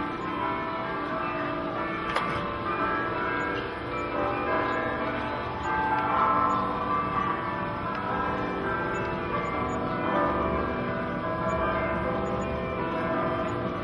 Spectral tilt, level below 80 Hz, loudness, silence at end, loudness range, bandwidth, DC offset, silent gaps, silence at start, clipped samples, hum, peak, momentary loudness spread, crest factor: -7 dB/octave; -46 dBFS; -28 LUFS; 0 s; 2 LU; 11.5 kHz; under 0.1%; none; 0 s; under 0.1%; none; -12 dBFS; 5 LU; 16 dB